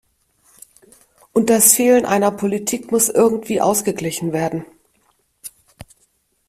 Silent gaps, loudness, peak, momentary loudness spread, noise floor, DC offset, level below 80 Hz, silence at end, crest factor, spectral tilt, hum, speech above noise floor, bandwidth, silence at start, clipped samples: none; -16 LUFS; 0 dBFS; 20 LU; -63 dBFS; under 0.1%; -58 dBFS; 1 s; 20 dB; -3.5 dB/octave; none; 47 dB; 16 kHz; 1.35 s; under 0.1%